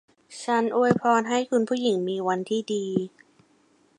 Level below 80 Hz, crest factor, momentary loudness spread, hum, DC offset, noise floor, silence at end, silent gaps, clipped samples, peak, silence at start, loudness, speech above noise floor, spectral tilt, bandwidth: -70 dBFS; 18 dB; 8 LU; none; under 0.1%; -62 dBFS; 0.9 s; none; under 0.1%; -6 dBFS; 0.3 s; -24 LUFS; 38 dB; -5.5 dB/octave; 11 kHz